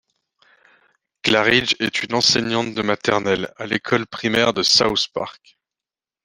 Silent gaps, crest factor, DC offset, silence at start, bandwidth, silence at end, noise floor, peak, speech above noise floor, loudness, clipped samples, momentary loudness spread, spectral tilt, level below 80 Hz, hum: none; 20 dB; under 0.1%; 1.25 s; 14 kHz; 0.95 s; -90 dBFS; -2 dBFS; 70 dB; -18 LUFS; under 0.1%; 10 LU; -3 dB/octave; -54 dBFS; none